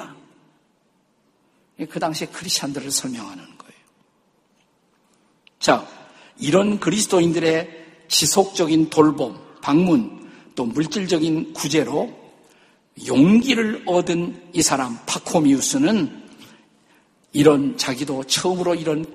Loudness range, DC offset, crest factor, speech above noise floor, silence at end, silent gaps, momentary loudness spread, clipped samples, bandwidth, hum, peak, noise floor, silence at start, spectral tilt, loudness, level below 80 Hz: 9 LU; under 0.1%; 20 dB; 44 dB; 0 s; none; 13 LU; under 0.1%; 15 kHz; none; 0 dBFS; -64 dBFS; 0 s; -4 dB/octave; -20 LUFS; -60 dBFS